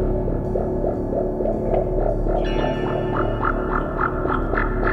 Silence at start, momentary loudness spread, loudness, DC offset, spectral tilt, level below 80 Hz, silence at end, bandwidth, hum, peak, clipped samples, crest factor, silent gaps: 0 s; 2 LU; -23 LUFS; 0.1%; -9 dB/octave; -26 dBFS; 0 s; 6 kHz; none; -6 dBFS; under 0.1%; 14 dB; none